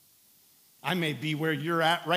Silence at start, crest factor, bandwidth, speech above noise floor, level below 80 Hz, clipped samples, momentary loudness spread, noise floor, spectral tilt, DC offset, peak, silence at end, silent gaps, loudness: 0.85 s; 20 dB; 16 kHz; 33 dB; -84 dBFS; under 0.1%; 6 LU; -61 dBFS; -5 dB/octave; under 0.1%; -10 dBFS; 0 s; none; -29 LUFS